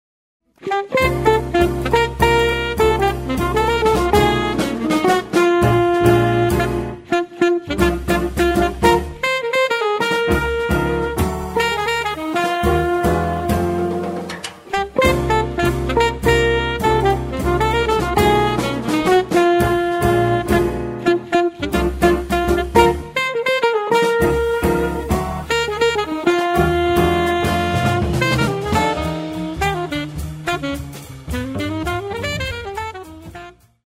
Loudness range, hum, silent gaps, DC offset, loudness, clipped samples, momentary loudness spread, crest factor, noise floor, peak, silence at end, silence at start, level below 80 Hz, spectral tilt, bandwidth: 4 LU; none; none; under 0.1%; -18 LUFS; under 0.1%; 9 LU; 18 dB; -38 dBFS; 0 dBFS; 0.35 s; 0.6 s; -30 dBFS; -5.5 dB/octave; 16 kHz